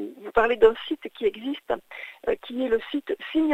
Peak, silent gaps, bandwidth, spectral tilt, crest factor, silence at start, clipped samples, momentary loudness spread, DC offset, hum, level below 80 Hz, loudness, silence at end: -4 dBFS; none; 8 kHz; -5.5 dB/octave; 20 dB; 0 s; under 0.1%; 12 LU; under 0.1%; none; -50 dBFS; -25 LUFS; 0 s